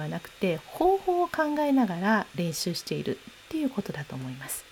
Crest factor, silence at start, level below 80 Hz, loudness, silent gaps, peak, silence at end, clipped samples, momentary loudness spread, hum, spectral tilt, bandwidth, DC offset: 16 dB; 0 s; -58 dBFS; -28 LUFS; none; -12 dBFS; 0 s; under 0.1%; 12 LU; none; -5 dB/octave; over 20 kHz; under 0.1%